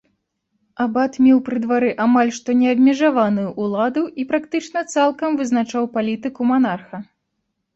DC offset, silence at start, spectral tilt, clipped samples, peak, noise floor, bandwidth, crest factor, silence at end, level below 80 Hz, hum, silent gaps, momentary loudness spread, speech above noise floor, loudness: under 0.1%; 0.8 s; -5.5 dB/octave; under 0.1%; -4 dBFS; -74 dBFS; 8 kHz; 14 dB; 0.7 s; -62 dBFS; none; none; 9 LU; 56 dB; -18 LUFS